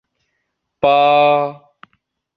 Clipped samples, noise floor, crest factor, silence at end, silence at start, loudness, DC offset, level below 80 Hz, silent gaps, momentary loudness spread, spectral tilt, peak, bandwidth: under 0.1%; -73 dBFS; 16 dB; 0.8 s; 0.85 s; -14 LUFS; under 0.1%; -58 dBFS; none; 8 LU; -7 dB/octave; -2 dBFS; 5.2 kHz